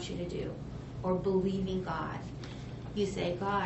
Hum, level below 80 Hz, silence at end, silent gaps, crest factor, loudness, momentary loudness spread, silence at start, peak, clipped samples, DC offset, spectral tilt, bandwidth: none; -50 dBFS; 0 s; none; 16 dB; -35 LUFS; 12 LU; 0 s; -18 dBFS; under 0.1%; under 0.1%; -6 dB/octave; 8 kHz